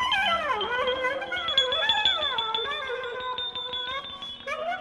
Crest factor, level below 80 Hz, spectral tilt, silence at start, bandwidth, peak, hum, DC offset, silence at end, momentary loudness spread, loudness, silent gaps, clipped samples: 18 dB; -58 dBFS; -1.5 dB/octave; 0 s; 13.5 kHz; -10 dBFS; none; under 0.1%; 0 s; 10 LU; -26 LUFS; none; under 0.1%